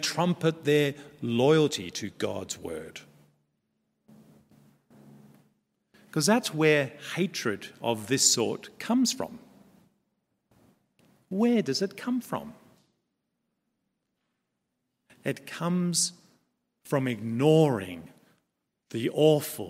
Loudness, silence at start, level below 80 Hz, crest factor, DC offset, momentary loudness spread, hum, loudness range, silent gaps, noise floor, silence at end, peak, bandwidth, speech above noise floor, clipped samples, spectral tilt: -27 LUFS; 0 s; -72 dBFS; 22 dB; under 0.1%; 14 LU; none; 13 LU; none; -81 dBFS; 0 s; -8 dBFS; 16 kHz; 54 dB; under 0.1%; -4 dB/octave